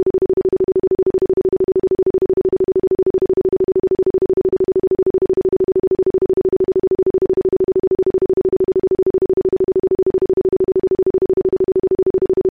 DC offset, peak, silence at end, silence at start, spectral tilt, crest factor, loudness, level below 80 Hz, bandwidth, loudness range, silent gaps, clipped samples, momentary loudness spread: 0.5%; -10 dBFS; 0 s; 0 s; -11 dB/octave; 6 dB; -16 LUFS; -42 dBFS; 2.5 kHz; 0 LU; 3.10-3.14 s, 12.10-12.14 s; under 0.1%; 0 LU